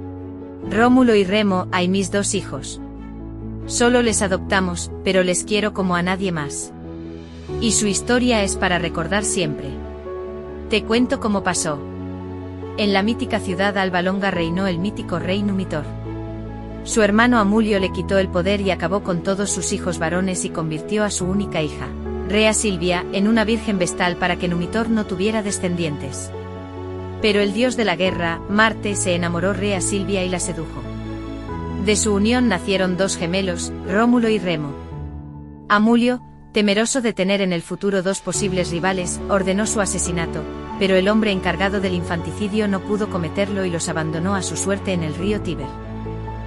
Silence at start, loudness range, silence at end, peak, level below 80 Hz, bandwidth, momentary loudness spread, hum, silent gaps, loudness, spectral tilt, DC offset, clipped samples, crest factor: 0 s; 3 LU; 0 s; -2 dBFS; -40 dBFS; 12 kHz; 14 LU; none; none; -20 LUFS; -4.5 dB/octave; under 0.1%; under 0.1%; 18 dB